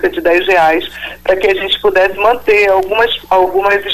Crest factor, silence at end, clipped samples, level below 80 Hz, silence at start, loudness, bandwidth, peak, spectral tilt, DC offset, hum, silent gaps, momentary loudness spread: 10 dB; 0 s; under 0.1%; -40 dBFS; 0 s; -11 LUFS; 15 kHz; -2 dBFS; -4 dB/octave; under 0.1%; none; none; 5 LU